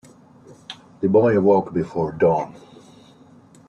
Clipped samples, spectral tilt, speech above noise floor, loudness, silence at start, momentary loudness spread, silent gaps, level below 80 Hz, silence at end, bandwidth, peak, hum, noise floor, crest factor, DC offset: under 0.1%; -8.5 dB/octave; 31 dB; -19 LUFS; 0.7 s; 23 LU; none; -58 dBFS; 1.2 s; 8.6 kHz; -6 dBFS; none; -49 dBFS; 16 dB; under 0.1%